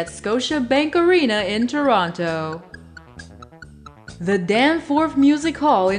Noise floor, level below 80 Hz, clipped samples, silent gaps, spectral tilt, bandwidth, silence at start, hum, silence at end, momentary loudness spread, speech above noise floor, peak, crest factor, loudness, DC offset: -42 dBFS; -50 dBFS; under 0.1%; none; -5 dB/octave; 10.5 kHz; 0 s; none; 0 s; 8 LU; 24 dB; -4 dBFS; 16 dB; -19 LUFS; under 0.1%